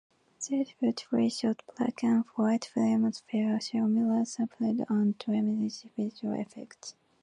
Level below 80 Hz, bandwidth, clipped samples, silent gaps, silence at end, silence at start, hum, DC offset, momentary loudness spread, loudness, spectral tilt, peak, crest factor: -78 dBFS; 10.5 kHz; under 0.1%; none; 0.3 s; 0.4 s; none; under 0.1%; 9 LU; -30 LUFS; -5.5 dB/octave; -16 dBFS; 14 dB